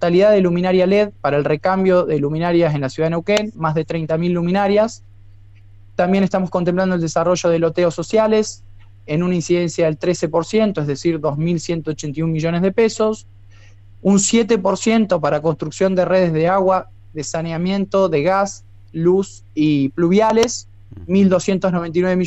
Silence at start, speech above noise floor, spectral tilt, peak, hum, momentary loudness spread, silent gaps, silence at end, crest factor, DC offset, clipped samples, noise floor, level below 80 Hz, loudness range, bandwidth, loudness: 0 s; 26 dB; -6 dB/octave; -4 dBFS; none; 7 LU; none; 0 s; 12 dB; under 0.1%; under 0.1%; -42 dBFS; -46 dBFS; 3 LU; 8.4 kHz; -17 LUFS